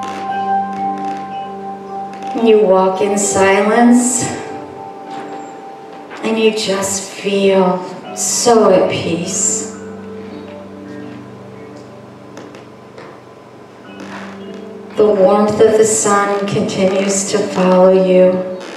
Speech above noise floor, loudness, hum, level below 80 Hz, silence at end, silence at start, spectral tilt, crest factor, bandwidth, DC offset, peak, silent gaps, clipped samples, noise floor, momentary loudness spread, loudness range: 25 dB; -13 LUFS; none; -60 dBFS; 0 s; 0 s; -4 dB/octave; 14 dB; 14.5 kHz; under 0.1%; 0 dBFS; none; under 0.1%; -37 dBFS; 23 LU; 20 LU